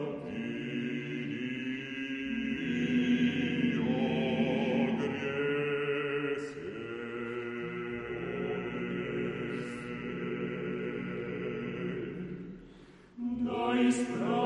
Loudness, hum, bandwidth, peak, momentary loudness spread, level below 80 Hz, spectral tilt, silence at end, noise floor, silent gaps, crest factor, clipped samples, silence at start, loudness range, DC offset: -34 LUFS; none; 10 kHz; -16 dBFS; 10 LU; -64 dBFS; -6.5 dB/octave; 0 s; -54 dBFS; none; 16 dB; under 0.1%; 0 s; 7 LU; under 0.1%